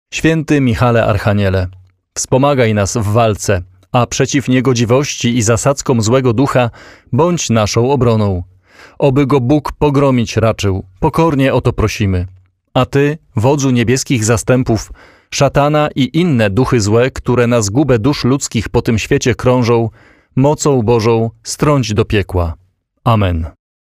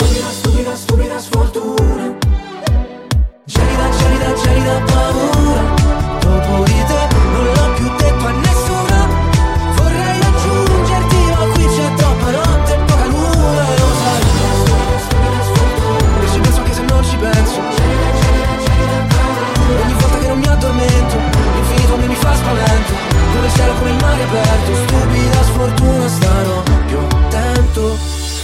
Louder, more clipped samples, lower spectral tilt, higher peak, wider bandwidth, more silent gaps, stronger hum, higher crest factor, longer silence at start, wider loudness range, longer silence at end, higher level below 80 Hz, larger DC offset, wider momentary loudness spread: about the same, -13 LUFS vs -13 LUFS; neither; about the same, -5.5 dB/octave vs -5.5 dB/octave; about the same, 0 dBFS vs 0 dBFS; about the same, 15.5 kHz vs 16 kHz; neither; neither; about the same, 12 dB vs 12 dB; about the same, 0.1 s vs 0 s; about the same, 1 LU vs 1 LU; first, 0.5 s vs 0 s; second, -34 dBFS vs -16 dBFS; neither; first, 7 LU vs 3 LU